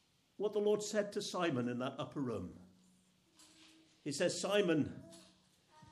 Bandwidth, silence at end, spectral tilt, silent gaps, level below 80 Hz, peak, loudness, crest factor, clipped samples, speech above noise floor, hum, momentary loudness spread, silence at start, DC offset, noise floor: 13 kHz; 0.05 s; -4.5 dB/octave; none; -76 dBFS; -20 dBFS; -37 LUFS; 20 dB; under 0.1%; 34 dB; none; 13 LU; 0.4 s; under 0.1%; -71 dBFS